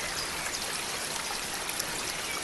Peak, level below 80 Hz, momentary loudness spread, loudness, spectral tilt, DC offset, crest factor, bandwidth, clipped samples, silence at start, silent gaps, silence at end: -10 dBFS; -56 dBFS; 1 LU; -31 LUFS; -0.5 dB/octave; under 0.1%; 24 dB; 16.5 kHz; under 0.1%; 0 s; none; 0 s